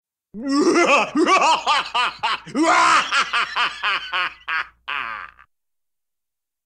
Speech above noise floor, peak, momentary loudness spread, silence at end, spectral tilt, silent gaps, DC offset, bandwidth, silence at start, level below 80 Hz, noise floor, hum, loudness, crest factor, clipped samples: 67 dB; -4 dBFS; 12 LU; 1.4 s; -2 dB/octave; none; under 0.1%; 11.5 kHz; 0.35 s; -60 dBFS; -86 dBFS; none; -19 LUFS; 18 dB; under 0.1%